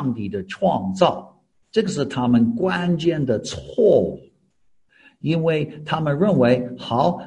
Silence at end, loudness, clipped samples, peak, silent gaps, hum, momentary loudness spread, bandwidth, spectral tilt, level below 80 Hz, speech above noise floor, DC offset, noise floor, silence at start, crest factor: 0 s; -21 LUFS; under 0.1%; 0 dBFS; none; none; 11 LU; 10 kHz; -7 dB/octave; -52 dBFS; 43 dB; under 0.1%; -62 dBFS; 0 s; 20 dB